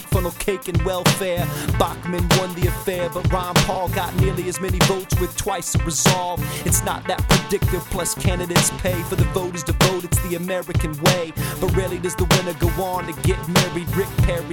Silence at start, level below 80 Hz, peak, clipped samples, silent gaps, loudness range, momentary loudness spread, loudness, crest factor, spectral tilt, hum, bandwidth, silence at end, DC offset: 0 s; -30 dBFS; -4 dBFS; under 0.1%; none; 1 LU; 6 LU; -21 LUFS; 16 dB; -4.5 dB/octave; none; 19.5 kHz; 0 s; under 0.1%